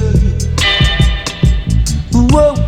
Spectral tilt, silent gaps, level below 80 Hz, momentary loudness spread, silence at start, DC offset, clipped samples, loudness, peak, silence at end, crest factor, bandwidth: -5.5 dB/octave; none; -16 dBFS; 5 LU; 0 s; under 0.1%; under 0.1%; -12 LUFS; 0 dBFS; 0 s; 10 dB; 14.5 kHz